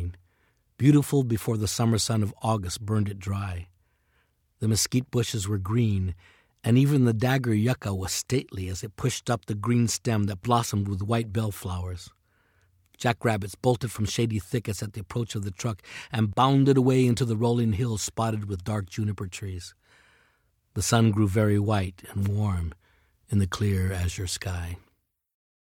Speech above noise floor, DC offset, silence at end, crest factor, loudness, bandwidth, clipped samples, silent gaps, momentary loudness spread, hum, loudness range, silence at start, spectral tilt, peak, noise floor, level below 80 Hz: 46 dB; under 0.1%; 0.95 s; 20 dB; -26 LUFS; 17 kHz; under 0.1%; none; 12 LU; none; 5 LU; 0 s; -5.5 dB/octave; -6 dBFS; -71 dBFS; -54 dBFS